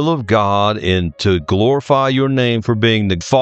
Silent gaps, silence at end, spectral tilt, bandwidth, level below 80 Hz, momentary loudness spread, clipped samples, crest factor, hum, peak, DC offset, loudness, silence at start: none; 0 s; -6 dB/octave; 8.4 kHz; -42 dBFS; 3 LU; under 0.1%; 14 dB; none; 0 dBFS; under 0.1%; -15 LUFS; 0 s